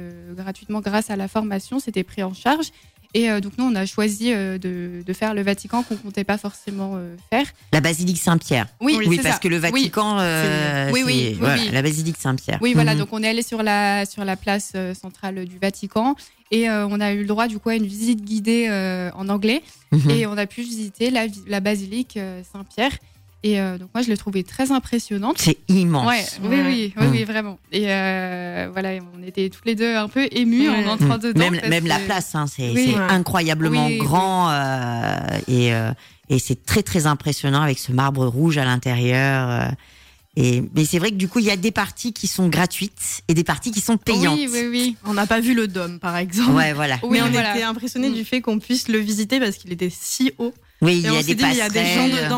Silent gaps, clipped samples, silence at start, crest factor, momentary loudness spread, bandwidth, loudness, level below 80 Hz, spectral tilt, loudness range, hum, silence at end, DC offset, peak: none; under 0.1%; 0 s; 14 dB; 9 LU; 16.5 kHz; -20 LUFS; -50 dBFS; -5 dB/octave; 4 LU; none; 0 s; under 0.1%; -6 dBFS